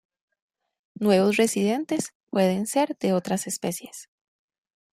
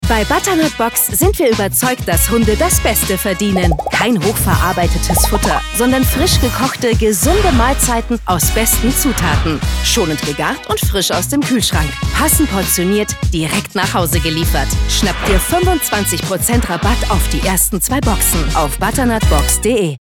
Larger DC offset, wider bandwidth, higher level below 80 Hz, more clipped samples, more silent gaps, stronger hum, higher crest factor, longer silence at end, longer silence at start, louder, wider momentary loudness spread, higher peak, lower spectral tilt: neither; second, 15.5 kHz vs 19.5 kHz; second, -70 dBFS vs -20 dBFS; neither; first, 2.15-2.27 s vs none; neither; about the same, 18 dB vs 14 dB; first, 0.9 s vs 0.05 s; first, 1 s vs 0 s; second, -24 LUFS vs -14 LUFS; first, 10 LU vs 4 LU; second, -8 dBFS vs 0 dBFS; about the same, -5 dB/octave vs -4 dB/octave